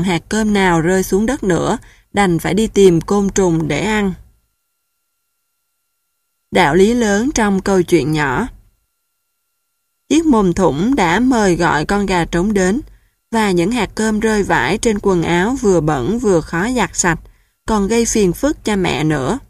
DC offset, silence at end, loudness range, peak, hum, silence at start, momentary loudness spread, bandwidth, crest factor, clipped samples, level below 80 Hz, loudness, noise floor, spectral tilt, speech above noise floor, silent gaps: under 0.1%; 0.1 s; 3 LU; 0 dBFS; none; 0 s; 6 LU; 15 kHz; 16 dB; under 0.1%; -36 dBFS; -15 LUFS; -70 dBFS; -5 dB/octave; 56 dB; none